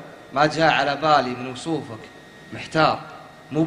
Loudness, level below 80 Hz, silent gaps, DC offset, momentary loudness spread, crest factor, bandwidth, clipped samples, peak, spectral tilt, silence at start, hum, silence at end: -21 LUFS; -56 dBFS; none; under 0.1%; 21 LU; 20 dB; 11 kHz; under 0.1%; -2 dBFS; -5 dB/octave; 0 s; none; 0 s